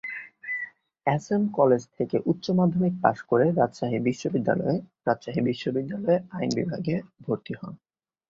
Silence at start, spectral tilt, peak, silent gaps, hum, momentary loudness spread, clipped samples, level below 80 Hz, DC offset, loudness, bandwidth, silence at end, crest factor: 0.05 s; -7.5 dB/octave; -4 dBFS; none; none; 10 LU; under 0.1%; -62 dBFS; under 0.1%; -26 LUFS; 7.6 kHz; 0.55 s; 22 dB